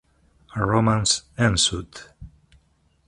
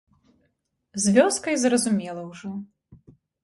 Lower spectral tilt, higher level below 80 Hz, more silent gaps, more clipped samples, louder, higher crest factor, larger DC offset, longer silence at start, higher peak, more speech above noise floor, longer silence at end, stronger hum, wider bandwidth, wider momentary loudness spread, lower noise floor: about the same, -3.5 dB/octave vs -4 dB/octave; first, -44 dBFS vs -66 dBFS; neither; neither; about the same, -21 LUFS vs -22 LUFS; about the same, 20 dB vs 20 dB; neither; second, 0.55 s vs 0.95 s; about the same, -4 dBFS vs -6 dBFS; second, 41 dB vs 51 dB; first, 0.8 s vs 0.5 s; neither; about the same, 11.5 kHz vs 11.5 kHz; about the same, 18 LU vs 17 LU; second, -63 dBFS vs -73 dBFS